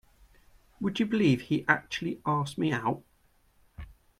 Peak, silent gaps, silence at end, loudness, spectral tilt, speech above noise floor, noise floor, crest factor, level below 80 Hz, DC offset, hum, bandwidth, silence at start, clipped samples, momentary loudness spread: -6 dBFS; none; 0.3 s; -29 LUFS; -6 dB/octave; 38 dB; -66 dBFS; 24 dB; -58 dBFS; under 0.1%; none; 14 kHz; 0.8 s; under 0.1%; 17 LU